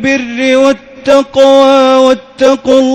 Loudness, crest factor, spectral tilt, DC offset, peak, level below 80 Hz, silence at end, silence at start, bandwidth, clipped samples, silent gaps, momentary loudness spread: -8 LUFS; 8 dB; -3.5 dB/octave; under 0.1%; 0 dBFS; -46 dBFS; 0 s; 0 s; 9.2 kHz; 4%; none; 6 LU